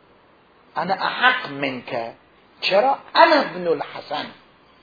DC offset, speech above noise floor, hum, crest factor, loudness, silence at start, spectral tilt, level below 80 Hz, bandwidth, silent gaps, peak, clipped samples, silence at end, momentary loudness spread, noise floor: under 0.1%; 34 dB; none; 22 dB; -20 LUFS; 0.75 s; -5 dB/octave; -68 dBFS; 5 kHz; none; 0 dBFS; under 0.1%; 0.5 s; 15 LU; -54 dBFS